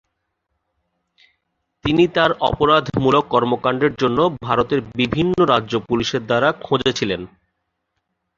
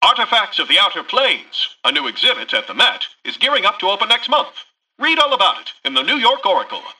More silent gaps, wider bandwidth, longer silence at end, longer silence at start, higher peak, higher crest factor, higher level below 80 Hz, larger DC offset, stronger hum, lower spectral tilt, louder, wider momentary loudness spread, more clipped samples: neither; second, 7.4 kHz vs 12 kHz; first, 1.1 s vs 0.05 s; first, 1.85 s vs 0 s; about the same, -2 dBFS vs -2 dBFS; about the same, 18 dB vs 16 dB; first, -46 dBFS vs -64 dBFS; neither; neither; first, -6 dB/octave vs -1 dB/octave; second, -18 LUFS vs -15 LUFS; about the same, 6 LU vs 7 LU; neither